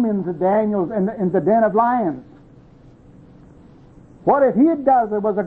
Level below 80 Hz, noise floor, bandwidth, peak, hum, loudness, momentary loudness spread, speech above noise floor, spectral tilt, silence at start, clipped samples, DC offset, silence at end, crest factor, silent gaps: -54 dBFS; -46 dBFS; 4.1 kHz; -4 dBFS; none; -18 LUFS; 7 LU; 29 dB; -11 dB/octave; 0 s; under 0.1%; under 0.1%; 0 s; 16 dB; none